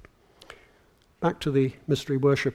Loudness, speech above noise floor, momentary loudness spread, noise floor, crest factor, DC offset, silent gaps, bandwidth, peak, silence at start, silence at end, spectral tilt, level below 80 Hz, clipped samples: -26 LUFS; 36 dB; 6 LU; -61 dBFS; 18 dB; under 0.1%; none; 13.5 kHz; -10 dBFS; 0.5 s; 0 s; -6.5 dB/octave; -56 dBFS; under 0.1%